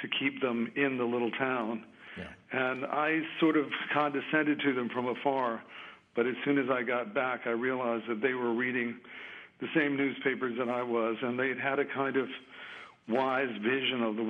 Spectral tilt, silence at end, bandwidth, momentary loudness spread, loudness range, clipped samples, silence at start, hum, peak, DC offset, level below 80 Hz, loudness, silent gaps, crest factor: -7.5 dB/octave; 0 s; 5.4 kHz; 15 LU; 2 LU; under 0.1%; 0 s; none; -12 dBFS; under 0.1%; -80 dBFS; -31 LUFS; none; 18 dB